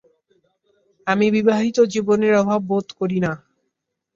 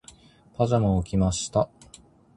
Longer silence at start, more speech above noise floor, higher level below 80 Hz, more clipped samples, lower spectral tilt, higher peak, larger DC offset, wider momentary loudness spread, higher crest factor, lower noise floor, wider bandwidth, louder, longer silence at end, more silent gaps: first, 1.05 s vs 0.6 s; first, 59 dB vs 30 dB; second, -60 dBFS vs -40 dBFS; neither; about the same, -6.5 dB/octave vs -6.5 dB/octave; first, -4 dBFS vs -8 dBFS; neither; about the same, 8 LU vs 8 LU; about the same, 18 dB vs 18 dB; first, -77 dBFS vs -53 dBFS; second, 7.6 kHz vs 11 kHz; first, -19 LUFS vs -25 LUFS; about the same, 0.8 s vs 0.7 s; neither